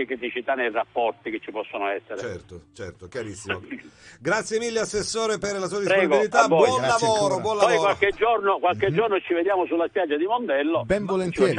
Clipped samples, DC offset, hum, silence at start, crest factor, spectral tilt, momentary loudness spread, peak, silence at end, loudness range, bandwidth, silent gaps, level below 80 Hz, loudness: under 0.1%; under 0.1%; none; 0 s; 20 dB; -4 dB/octave; 14 LU; -4 dBFS; 0 s; 10 LU; 11 kHz; none; -54 dBFS; -23 LUFS